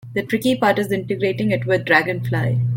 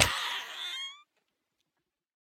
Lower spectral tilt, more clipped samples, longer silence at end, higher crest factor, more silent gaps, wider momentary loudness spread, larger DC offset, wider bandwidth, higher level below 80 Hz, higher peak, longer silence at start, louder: first, -6.5 dB/octave vs -0.5 dB/octave; neither; second, 0 s vs 1.2 s; second, 16 dB vs 32 dB; neither; second, 6 LU vs 14 LU; neither; second, 17 kHz vs 19.5 kHz; about the same, -54 dBFS vs -56 dBFS; about the same, -2 dBFS vs -4 dBFS; about the same, 0.05 s vs 0 s; first, -19 LUFS vs -33 LUFS